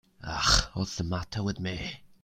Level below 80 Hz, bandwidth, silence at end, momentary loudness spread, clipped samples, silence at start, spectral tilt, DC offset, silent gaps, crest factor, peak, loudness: -40 dBFS; 16 kHz; 0.1 s; 14 LU; under 0.1%; 0.2 s; -3 dB/octave; under 0.1%; none; 22 dB; -8 dBFS; -29 LUFS